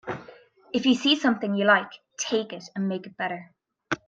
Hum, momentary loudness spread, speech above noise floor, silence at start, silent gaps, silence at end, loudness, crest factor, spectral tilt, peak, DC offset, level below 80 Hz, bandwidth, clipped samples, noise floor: none; 16 LU; 26 dB; 0.05 s; none; 0.1 s; -25 LUFS; 22 dB; -4 dB/octave; -6 dBFS; under 0.1%; -70 dBFS; 9.2 kHz; under 0.1%; -51 dBFS